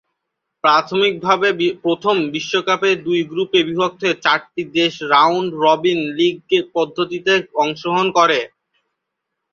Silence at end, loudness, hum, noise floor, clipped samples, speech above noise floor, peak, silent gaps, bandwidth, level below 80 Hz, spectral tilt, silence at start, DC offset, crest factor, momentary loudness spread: 1.05 s; -17 LUFS; none; -78 dBFS; under 0.1%; 61 dB; -2 dBFS; none; 7.2 kHz; -62 dBFS; -4.5 dB/octave; 0.65 s; under 0.1%; 16 dB; 6 LU